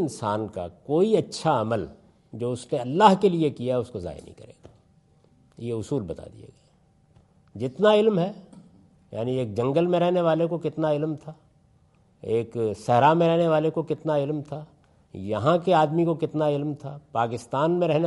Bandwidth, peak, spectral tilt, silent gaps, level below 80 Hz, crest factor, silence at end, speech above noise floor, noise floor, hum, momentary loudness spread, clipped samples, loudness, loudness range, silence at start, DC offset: 11.5 kHz; -4 dBFS; -7 dB/octave; none; -62 dBFS; 22 dB; 0 s; 37 dB; -61 dBFS; none; 18 LU; under 0.1%; -24 LUFS; 7 LU; 0 s; under 0.1%